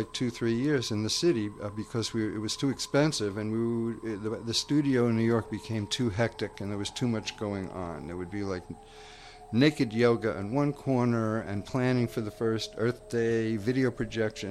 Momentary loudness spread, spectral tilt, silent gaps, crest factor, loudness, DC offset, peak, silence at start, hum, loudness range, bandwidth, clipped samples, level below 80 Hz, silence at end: 10 LU; -5.5 dB/octave; none; 20 dB; -30 LUFS; under 0.1%; -8 dBFS; 0 s; none; 5 LU; 14 kHz; under 0.1%; -56 dBFS; 0 s